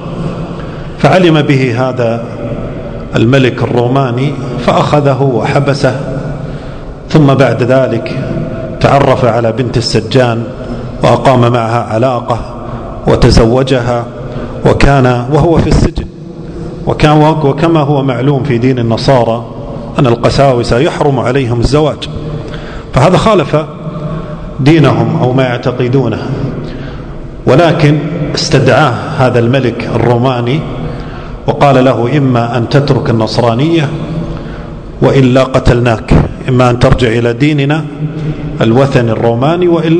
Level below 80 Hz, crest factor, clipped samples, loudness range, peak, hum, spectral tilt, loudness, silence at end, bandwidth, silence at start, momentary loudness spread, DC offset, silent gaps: -24 dBFS; 10 dB; 3%; 2 LU; 0 dBFS; none; -7 dB/octave; -10 LUFS; 0 s; 10 kHz; 0 s; 14 LU; under 0.1%; none